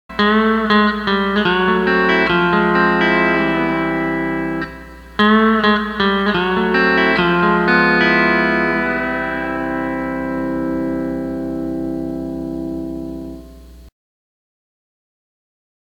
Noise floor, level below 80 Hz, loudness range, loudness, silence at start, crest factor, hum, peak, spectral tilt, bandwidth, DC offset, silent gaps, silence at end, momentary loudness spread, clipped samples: -39 dBFS; -40 dBFS; 13 LU; -16 LUFS; 0.1 s; 18 dB; none; 0 dBFS; -7 dB/octave; 8.4 kHz; under 0.1%; none; 2 s; 12 LU; under 0.1%